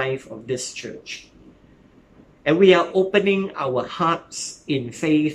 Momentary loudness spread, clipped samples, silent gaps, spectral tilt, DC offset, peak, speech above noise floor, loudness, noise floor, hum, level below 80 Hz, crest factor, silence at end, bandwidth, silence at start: 18 LU; under 0.1%; none; -5 dB/octave; under 0.1%; -2 dBFS; 31 dB; -21 LUFS; -52 dBFS; none; -60 dBFS; 20 dB; 0 s; 11.5 kHz; 0 s